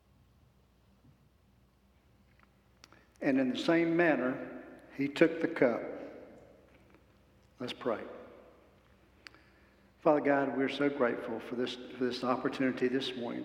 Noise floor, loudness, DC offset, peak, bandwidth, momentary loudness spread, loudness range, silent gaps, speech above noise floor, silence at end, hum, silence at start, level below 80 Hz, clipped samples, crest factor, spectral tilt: -66 dBFS; -32 LUFS; under 0.1%; -12 dBFS; 11.5 kHz; 18 LU; 13 LU; none; 35 dB; 0 s; none; 3.2 s; -70 dBFS; under 0.1%; 24 dB; -6 dB/octave